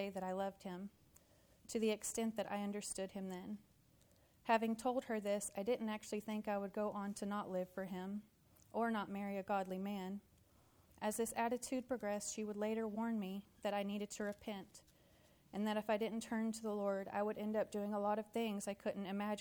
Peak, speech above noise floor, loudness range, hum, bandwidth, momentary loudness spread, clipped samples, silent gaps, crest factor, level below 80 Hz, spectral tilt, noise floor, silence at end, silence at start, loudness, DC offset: -24 dBFS; 29 dB; 3 LU; none; 19.5 kHz; 9 LU; under 0.1%; none; 20 dB; -76 dBFS; -4.5 dB/octave; -71 dBFS; 0 s; 0 s; -42 LUFS; under 0.1%